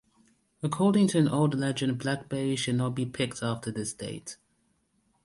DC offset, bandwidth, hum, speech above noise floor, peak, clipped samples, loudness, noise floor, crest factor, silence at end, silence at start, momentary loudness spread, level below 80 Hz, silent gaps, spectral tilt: under 0.1%; 11.5 kHz; none; 44 dB; -12 dBFS; under 0.1%; -28 LUFS; -72 dBFS; 16 dB; 0.9 s; 0.6 s; 14 LU; -64 dBFS; none; -5.5 dB/octave